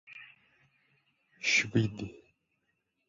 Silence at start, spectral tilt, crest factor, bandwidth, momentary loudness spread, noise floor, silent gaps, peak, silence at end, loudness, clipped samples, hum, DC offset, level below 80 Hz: 0.1 s; -4 dB/octave; 22 dB; 7.4 kHz; 23 LU; -80 dBFS; none; -14 dBFS; 0.9 s; -29 LUFS; under 0.1%; none; under 0.1%; -64 dBFS